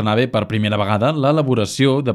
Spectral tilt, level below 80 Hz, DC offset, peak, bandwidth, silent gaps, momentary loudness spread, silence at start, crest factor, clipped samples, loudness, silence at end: -6.5 dB/octave; -54 dBFS; under 0.1%; -2 dBFS; 13 kHz; none; 3 LU; 0 s; 14 dB; under 0.1%; -17 LUFS; 0 s